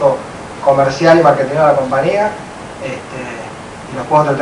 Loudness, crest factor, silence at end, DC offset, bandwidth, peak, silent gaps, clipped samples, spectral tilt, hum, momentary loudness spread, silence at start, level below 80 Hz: -13 LUFS; 14 dB; 0 s; under 0.1%; 11 kHz; 0 dBFS; none; 0.2%; -6 dB/octave; none; 18 LU; 0 s; -46 dBFS